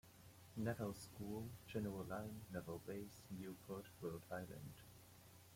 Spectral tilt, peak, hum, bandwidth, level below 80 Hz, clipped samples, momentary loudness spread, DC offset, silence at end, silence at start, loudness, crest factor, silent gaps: -6 dB/octave; -30 dBFS; none; 16.5 kHz; -74 dBFS; under 0.1%; 16 LU; under 0.1%; 0 s; 0.05 s; -50 LUFS; 20 dB; none